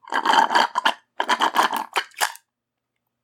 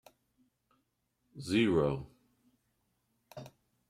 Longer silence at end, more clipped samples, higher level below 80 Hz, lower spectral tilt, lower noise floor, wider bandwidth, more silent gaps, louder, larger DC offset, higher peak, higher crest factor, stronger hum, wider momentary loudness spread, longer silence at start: first, 0.9 s vs 0.4 s; neither; second, -80 dBFS vs -62 dBFS; second, 0 dB/octave vs -6.5 dB/octave; about the same, -82 dBFS vs -80 dBFS; first, 18 kHz vs 15 kHz; neither; first, -21 LUFS vs -31 LUFS; neither; first, -2 dBFS vs -16 dBFS; about the same, 20 dB vs 20 dB; neither; second, 8 LU vs 24 LU; second, 0.05 s vs 1.35 s